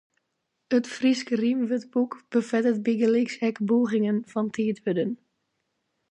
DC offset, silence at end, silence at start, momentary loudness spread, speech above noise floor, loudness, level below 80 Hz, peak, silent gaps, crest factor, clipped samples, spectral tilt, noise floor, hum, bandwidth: under 0.1%; 0.95 s; 0.7 s; 5 LU; 54 dB; -25 LUFS; -76 dBFS; -10 dBFS; none; 16 dB; under 0.1%; -6 dB/octave; -79 dBFS; none; 8.8 kHz